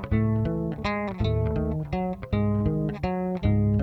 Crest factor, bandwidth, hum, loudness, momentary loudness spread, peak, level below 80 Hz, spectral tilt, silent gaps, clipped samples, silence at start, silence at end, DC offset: 14 dB; 6 kHz; none; -27 LUFS; 5 LU; -10 dBFS; -36 dBFS; -9.5 dB/octave; none; under 0.1%; 0 s; 0 s; under 0.1%